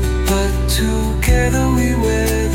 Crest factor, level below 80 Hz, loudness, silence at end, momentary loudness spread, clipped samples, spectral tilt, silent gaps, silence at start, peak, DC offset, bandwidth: 12 dB; -18 dBFS; -16 LUFS; 0 s; 2 LU; under 0.1%; -5 dB/octave; none; 0 s; -2 dBFS; under 0.1%; 17 kHz